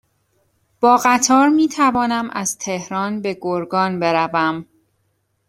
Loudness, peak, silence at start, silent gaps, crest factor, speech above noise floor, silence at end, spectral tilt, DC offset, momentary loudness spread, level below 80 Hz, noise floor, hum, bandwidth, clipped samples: -17 LUFS; -2 dBFS; 0.8 s; none; 18 dB; 50 dB; 0.85 s; -4 dB/octave; under 0.1%; 10 LU; -58 dBFS; -67 dBFS; none; 16 kHz; under 0.1%